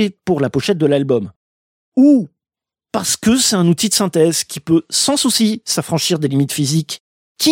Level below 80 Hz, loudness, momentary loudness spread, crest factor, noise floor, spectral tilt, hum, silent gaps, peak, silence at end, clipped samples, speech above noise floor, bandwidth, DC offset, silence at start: -54 dBFS; -15 LUFS; 8 LU; 14 dB; -89 dBFS; -4 dB/octave; none; 1.36-1.92 s, 7.00-7.35 s; -2 dBFS; 0 s; under 0.1%; 74 dB; 17 kHz; under 0.1%; 0 s